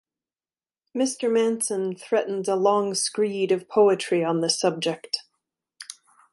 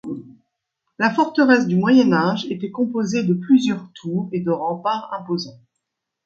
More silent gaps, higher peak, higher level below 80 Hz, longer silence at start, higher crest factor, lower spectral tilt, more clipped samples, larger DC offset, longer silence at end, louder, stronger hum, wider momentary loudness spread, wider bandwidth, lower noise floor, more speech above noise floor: neither; second, -8 dBFS vs 0 dBFS; second, -78 dBFS vs -66 dBFS; first, 0.95 s vs 0.05 s; about the same, 18 dB vs 20 dB; second, -3.5 dB/octave vs -6.5 dB/octave; neither; neither; second, 0.4 s vs 0.7 s; second, -24 LUFS vs -19 LUFS; neither; about the same, 11 LU vs 12 LU; first, 12 kHz vs 7.4 kHz; first, under -90 dBFS vs -79 dBFS; first, over 67 dB vs 60 dB